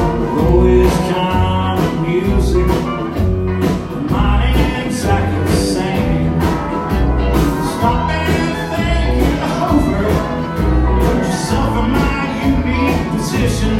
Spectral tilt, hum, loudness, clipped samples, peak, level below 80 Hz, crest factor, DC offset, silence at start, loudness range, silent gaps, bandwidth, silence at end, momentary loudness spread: -6.5 dB/octave; none; -15 LUFS; under 0.1%; 0 dBFS; -20 dBFS; 14 dB; under 0.1%; 0 s; 1 LU; none; 16 kHz; 0 s; 4 LU